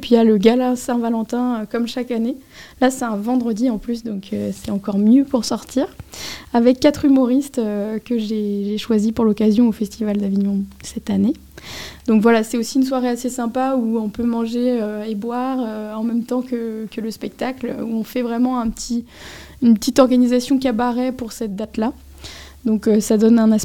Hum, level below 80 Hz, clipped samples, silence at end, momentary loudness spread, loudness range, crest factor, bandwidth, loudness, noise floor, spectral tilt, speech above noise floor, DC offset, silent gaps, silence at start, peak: none; -48 dBFS; under 0.1%; 0 s; 12 LU; 5 LU; 18 dB; 16.5 kHz; -19 LUFS; -37 dBFS; -6 dB/octave; 19 dB; 0.2%; none; 0 s; 0 dBFS